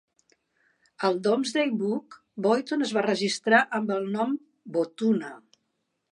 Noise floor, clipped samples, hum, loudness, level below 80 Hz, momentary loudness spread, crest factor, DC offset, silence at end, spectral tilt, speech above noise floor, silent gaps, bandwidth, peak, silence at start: -78 dBFS; under 0.1%; none; -26 LUFS; -80 dBFS; 10 LU; 20 dB; under 0.1%; 0.75 s; -4.5 dB/octave; 52 dB; none; 11 kHz; -6 dBFS; 1 s